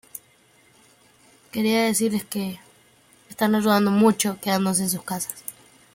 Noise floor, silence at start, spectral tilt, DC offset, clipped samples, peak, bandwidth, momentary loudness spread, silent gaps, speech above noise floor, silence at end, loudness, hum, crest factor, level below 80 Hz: -58 dBFS; 0.15 s; -4.5 dB/octave; under 0.1%; under 0.1%; -6 dBFS; 17 kHz; 19 LU; none; 36 dB; 0.45 s; -22 LUFS; none; 18 dB; -66 dBFS